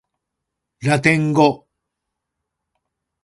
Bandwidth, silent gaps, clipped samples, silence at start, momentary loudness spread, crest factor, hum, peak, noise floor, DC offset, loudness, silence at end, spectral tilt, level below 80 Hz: 11.5 kHz; none; under 0.1%; 0.8 s; 10 LU; 22 dB; none; 0 dBFS; -80 dBFS; under 0.1%; -17 LUFS; 1.7 s; -6 dB/octave; -58 dBFS